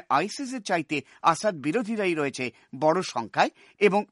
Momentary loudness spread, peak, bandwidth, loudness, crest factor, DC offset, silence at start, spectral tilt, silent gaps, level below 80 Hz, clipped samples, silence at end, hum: 8 LU; -6 dBFS; 11.5 kHz; -26 LUFS; 20 dB; under 0.1%; 0.1 s; -4.5 dB/octave; none; -74 dBFS; under 0.1%; 0.05 s; none